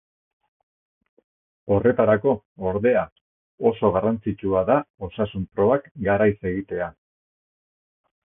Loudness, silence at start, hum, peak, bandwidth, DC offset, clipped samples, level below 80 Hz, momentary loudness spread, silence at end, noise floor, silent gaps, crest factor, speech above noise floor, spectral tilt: -22 LUFS; 1.65 s; none; -4 dBFS; 3.7 kHz; under 0.1%; under 0.1%; -48 dBFS; 10 LU; 1.4 s; under -90 dBFS; 2.45-2.56 s, 3.12-3.58 s, 4.90-4.94 s, 5.91-5.95 s; 20 dB; over 68 dB; -12 dB/octave